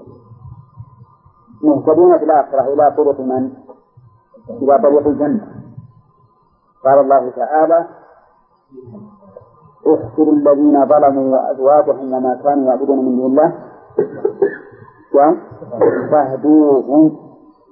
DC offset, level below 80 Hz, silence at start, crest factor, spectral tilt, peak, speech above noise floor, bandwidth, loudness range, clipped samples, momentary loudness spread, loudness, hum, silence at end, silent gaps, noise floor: under 0.1%; -58 dBFS; 0.3 s; 14 dB; -14.5 dB/octave; 0 dBFS; 43 dB; 2.3 kHz; 4 LU; under 0.1%; 10 LU; -13 LUFS; none; 0.5 s; none; -55 dBFS